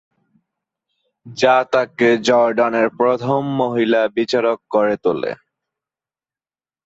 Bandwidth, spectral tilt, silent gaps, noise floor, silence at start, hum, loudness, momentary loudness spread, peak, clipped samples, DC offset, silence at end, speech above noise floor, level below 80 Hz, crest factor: 8 kHz; -5.5 dB/octave; none; under -90 dBFS; 1.25 s; none; -17 LUFS; 6 LU; -2 dBFS; under 0.1%; under 0.1%; 1.5 s; over 73 dB; -62 dBFS; 16 dB